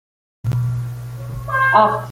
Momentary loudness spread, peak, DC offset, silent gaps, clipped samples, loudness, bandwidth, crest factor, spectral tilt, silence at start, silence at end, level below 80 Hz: 16 LU; -2 dBFS; under 0.1%; none; under 0.1%; -18 LUFS; 16 kHz; 18 dB; -7 dB/octave; 0.45 s; 0 s; -42 dBFS